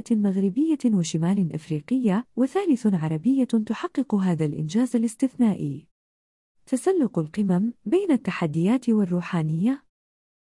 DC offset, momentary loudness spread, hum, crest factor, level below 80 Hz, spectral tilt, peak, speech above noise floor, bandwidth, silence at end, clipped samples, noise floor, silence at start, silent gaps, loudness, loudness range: under 0.1%; 5 LU; none; 12 dB; -68 dBFS; -7.5 dB/octave; -12 dBFS; over 67 dB; 12 kHz; 0.7 s; under 0.1%; under -90 dBFS; 0.05 s; 5.91-6.55 s; -24 LUFS; 2 LU